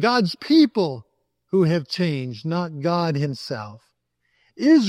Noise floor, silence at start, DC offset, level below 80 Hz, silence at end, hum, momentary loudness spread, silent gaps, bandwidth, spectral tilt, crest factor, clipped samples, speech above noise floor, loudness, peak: -70 dBFS; 0 s; under 0.1%; -68 dBFS; 0 s; none; 14 LU; none; 11.5 kHz; -7 dB/octave; 16 dB; under 0.1%; 50 dB; -22 LUFS; -6 dBFS